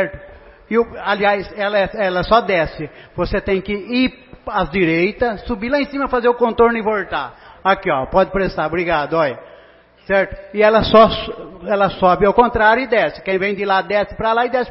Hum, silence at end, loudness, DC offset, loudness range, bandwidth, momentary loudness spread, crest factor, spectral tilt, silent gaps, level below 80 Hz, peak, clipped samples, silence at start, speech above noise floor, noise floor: none; 0 s; -17 LUFS; under 0.1%; 4 LU; 5.8 kHz; 11 LU; 16 dB; -9 dB/octave; none; -38 dBFS; 0 dBFS; under 0.1%; 0 s; 30 dB; -47 dBFS